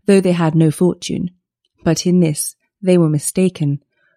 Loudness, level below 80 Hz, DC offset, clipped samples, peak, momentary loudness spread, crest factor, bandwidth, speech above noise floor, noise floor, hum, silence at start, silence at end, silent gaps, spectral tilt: -16 LUFS; -52 dBFS; under 0.1%; under 0.1%; 0 dBFS; 10 LU; 16 dB; 15 kHz; 42 dB; -57 dBFS; none; 0.1 s; 0.4 s; none; -6 dB/octave